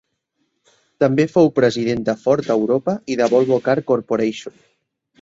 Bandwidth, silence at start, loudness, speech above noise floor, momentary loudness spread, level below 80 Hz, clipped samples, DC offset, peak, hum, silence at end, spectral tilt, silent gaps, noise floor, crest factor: 7.8 kHz; 1 s; -18 LUFS; 54 dB; 6 LU; -58 dBFS; under 0.1%; under 0.1%; -2 dBFS; none; 0.7 s; -6.5 dB/octave; none; -71 dBFS; 16 dB